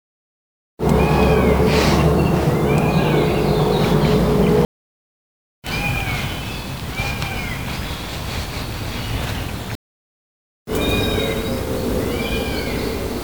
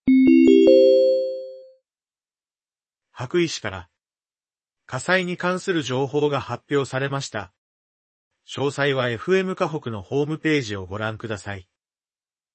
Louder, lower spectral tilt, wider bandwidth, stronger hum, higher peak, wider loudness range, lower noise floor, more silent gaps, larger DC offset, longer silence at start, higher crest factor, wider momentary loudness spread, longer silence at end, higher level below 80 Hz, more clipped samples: about the same, -19 LUFS vs -21 LUFS; about the same, -6 dB/octave vs -6 dB/octave; first, over 20 kHz vs 8.8 kHz; neither; about the same, -2 dBFS vs -2 dBFS; about the same, 9 LU vs 10 LU; about the same, under -90 dBFS vs under -90 dBFS; first, 4.65-5.62 s, 9.75-10.66 s vs 7.58-8.31 s; first, 0.7% vs under 0.1%; first, 0.8 s vs 0.05 s; about the same, 18 dB vs 20 dB; second, 11 LU vs 20 LU; second, 0 s vs 0.95 s; first, -30 dBFS vs -62 dBFS; neither